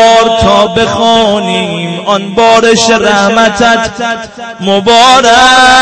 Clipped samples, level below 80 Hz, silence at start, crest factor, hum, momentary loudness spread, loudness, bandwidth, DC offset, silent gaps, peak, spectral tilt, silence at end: 4%; -34 dBFS; 0 s; 6 dB; none; 11 LU; -6 LUFS; 11 kHz; under 0.1%; none; 0 dBFS; -3 dB/octave; 0 s